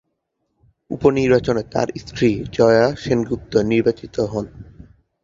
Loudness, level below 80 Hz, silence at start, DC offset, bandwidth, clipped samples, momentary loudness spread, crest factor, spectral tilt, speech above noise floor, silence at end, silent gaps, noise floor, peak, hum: -19 LUFS; -44 dBFS; 0.9 s; under 0.1%; 7.6 kHz; under 0.1%; 10 LU; 18 dB; -6.5 dB/octave; 55 dB; 0.6 s; none; -73 dBFS; -2 dBFS; none